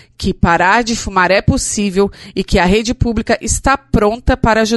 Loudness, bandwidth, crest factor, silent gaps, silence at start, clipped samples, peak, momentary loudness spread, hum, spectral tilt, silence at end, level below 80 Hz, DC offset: -14 LUFS; 12 kHz; 14 dB; none; 0.2 s; under 0.1%; 0 dBFS; 5 LU; none; -4.5 dB/octave; 0 s; -24 dBFS; under 0.1%